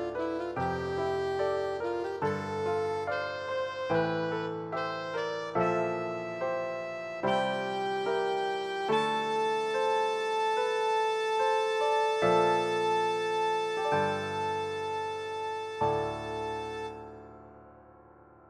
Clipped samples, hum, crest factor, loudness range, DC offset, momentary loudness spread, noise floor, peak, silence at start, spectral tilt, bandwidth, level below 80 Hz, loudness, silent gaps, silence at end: under 0.1%; none; 18 dB; 5 LU; under 0.1%; 8 LU; -55 dBFS; -14 dBFS; 0 s; -5 dB/octave; 12.5 kHz; -64 dBFS; -31 LUFS; none; 0.7 s